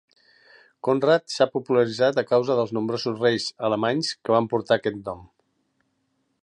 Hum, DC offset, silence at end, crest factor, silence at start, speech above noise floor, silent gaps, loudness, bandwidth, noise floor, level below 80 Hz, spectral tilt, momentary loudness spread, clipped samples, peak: none; under 0.1%; 1.2 s; 18 dB; 0.85 s; 49 dB; none; -23 LUFS; 11 kHz; -72 dBFS; -64 dBFS; -5 dB/octave; 8 LU; under 0.1%; -6 dBFS